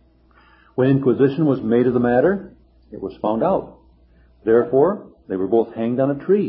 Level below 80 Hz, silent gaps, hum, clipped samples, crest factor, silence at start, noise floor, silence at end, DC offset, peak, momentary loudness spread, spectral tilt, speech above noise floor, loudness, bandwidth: -52 dBFS; none; none; under 0.1%; 16 dB; 0.75 s; -53 dBFS; 0 s; under 0.1%; -4 dBFS; 11 LU; -13 dB/octave; 35 dB; -19 LUFS; 5.2 kHz